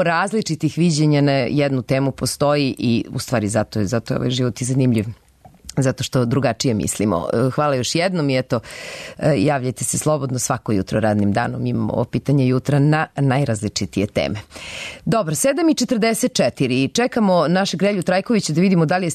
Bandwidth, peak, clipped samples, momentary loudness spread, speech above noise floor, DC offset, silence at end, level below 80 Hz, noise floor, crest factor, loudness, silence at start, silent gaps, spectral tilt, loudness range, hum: 13.5 kHz; -6 dBFS; under 0.1%; 6 LU; 23 dB; under 0.1%; 0 s; -48 dBFS; -41 dBFS; 12 dB; -19 LUFS; 0 s; none; -5.5 dB/octave; 3 LU; none